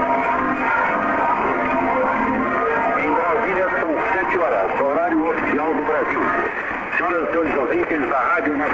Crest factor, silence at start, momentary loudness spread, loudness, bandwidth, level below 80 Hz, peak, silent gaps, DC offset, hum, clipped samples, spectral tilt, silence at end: 12 dB; 0 s; 2 LU; -19 LUFS; 7.8 kHz; -48 dBFS; -8 dBFS; none; under 0.1%; none; under 0.1%; -7 dB/octave; 0 s